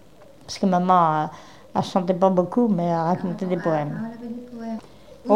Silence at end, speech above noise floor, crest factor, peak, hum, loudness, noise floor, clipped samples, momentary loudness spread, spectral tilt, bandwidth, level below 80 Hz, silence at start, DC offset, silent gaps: 0 s; 21 dB; 18 dB; -4 dBFS; none; -22 LUFS; -43 dBFS; under 0.1%; 17 LU; -7.5 dB/octave; 10.5 kHz; -62 dBFS; 0.5 s; 0.3%; none